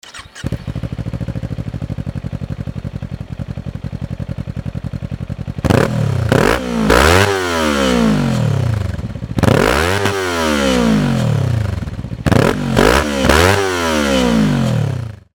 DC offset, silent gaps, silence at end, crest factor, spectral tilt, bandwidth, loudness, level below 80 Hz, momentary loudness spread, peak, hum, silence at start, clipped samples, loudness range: under 0.1%; none; 0.2 s; 16 dB; -5.5 dB/octave; 19.5 kHz; -16 LUFS; -28 dBFS; 14 LU; 0 dBFS; none; 0.05 s; under 0.1%; 11 LU